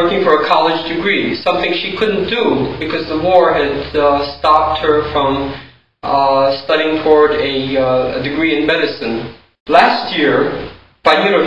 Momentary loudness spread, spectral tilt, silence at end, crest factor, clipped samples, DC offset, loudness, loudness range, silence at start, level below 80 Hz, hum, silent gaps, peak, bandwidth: 9 LU; -6.5 dB/octave; 0 s; 14 dB; under 0.1%; 0.8%; -14 LUFS; 1 LU; 0 s; -42 dBFS; none; 9.60-9.66 s; 0 dBFS; 8.2 kHz